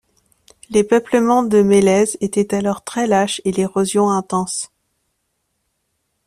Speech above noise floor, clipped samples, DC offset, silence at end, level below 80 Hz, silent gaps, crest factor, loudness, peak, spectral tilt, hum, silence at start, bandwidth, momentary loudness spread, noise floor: 55 dB; under 0.1%; under 0.1%; 1.6 s; -56 dBFS; none; 14 dB; -17 LUFS; -2 dBFS; -5 dB/octave; none; 0.7 s; 14 kHz; 8 LU; -71 dBFS